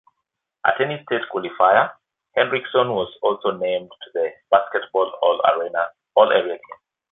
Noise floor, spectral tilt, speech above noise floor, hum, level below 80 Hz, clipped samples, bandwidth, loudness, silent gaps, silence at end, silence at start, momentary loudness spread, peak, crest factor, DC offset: -80 dBFS; -8.5 dB/octave; 60 dB; none; -66 dBFS; under 0.1%; 4 kHz; -20 LUFS; none; 0.4 s; 0.65 s; 10 LU; 0 dBFS; 20 dB; under 0.1%